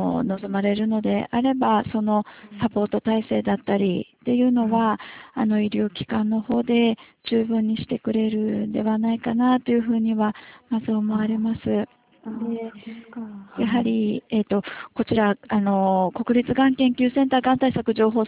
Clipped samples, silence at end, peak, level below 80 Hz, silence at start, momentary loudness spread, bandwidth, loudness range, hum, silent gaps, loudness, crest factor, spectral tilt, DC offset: under 0.1%; 0 s; -6 dBFS; -54 dBFS; 0 s; 10 LU; 4 kHz; 5 LU; none; none; -22 LUFS; 16 dB; -11 dB/octave; under 0.1%